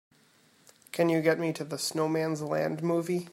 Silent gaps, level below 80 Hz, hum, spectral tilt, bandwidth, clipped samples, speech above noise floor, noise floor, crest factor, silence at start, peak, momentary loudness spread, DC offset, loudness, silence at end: none; -76 dBFS; none; -5.5 dB/octave; 16 kHz; under 0.1%; 35 dB; -63 dBFS; 18 dB; 0.95 s; -12 dBFS; 7 LU; under 0.1%; -29 LUFS; 0 s